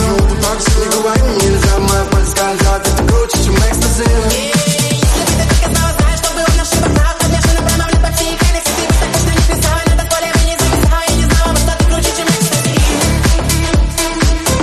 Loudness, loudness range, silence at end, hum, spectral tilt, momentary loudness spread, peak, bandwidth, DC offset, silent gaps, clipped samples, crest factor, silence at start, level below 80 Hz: -12 LUFS; 1 LU; 0 s; none; -4 dB/octave; 2 LU; 0 dBFS; 13.5 kHz; under 0.1%; none; under 0.1%; 12 dB; 0 s; -14 dBFS